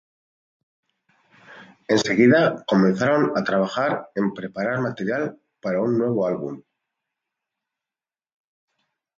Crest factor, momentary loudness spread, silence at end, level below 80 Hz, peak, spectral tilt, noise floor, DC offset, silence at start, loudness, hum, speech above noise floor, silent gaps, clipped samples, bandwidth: 20 dB; 13 LU; 2.6 s; -66 dBFS; -4 dBFS; -6 dB/octave; under -90 dBFS; under 0.1%; 1.5 s; -21 LUFS; none; over 69 dB; none; under 0.1%; 7.8 kHz